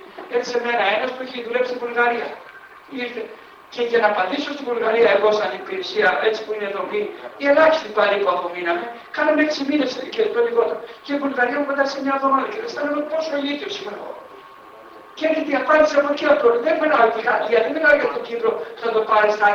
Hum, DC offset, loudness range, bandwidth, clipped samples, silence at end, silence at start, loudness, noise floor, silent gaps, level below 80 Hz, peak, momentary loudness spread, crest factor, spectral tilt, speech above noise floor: none; under 0.1%; 6 LU; 7.4 kHz; under 0.1%; 0 s; 0 s; -20 LUFS; -42 dBFS; none; -62 dBFS; -2 dBFS; 13 LU; 18 dB; -4 dB/octave; 23 dB